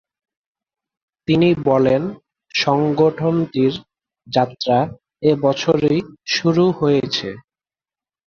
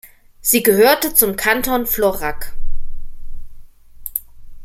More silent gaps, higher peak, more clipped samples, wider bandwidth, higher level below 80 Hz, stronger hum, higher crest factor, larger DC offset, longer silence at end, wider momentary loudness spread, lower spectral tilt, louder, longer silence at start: neither; about the same, -2 dBFS vs 0 dBFS; neither; second, 7 kHz vs 16.5 kHz; second, -54 dBFS vs -28 dBFS; neither; about the same, 18 dB vs 18 dB; neither; first, 0.9 s vs 0 s; second, 8 LU vs 22 LU; first, -6 dB/octave vs -2.5 dB/octave; about the same, -18 LUFS vs -16 LUFS; first, 1.3 s vs 0.05 s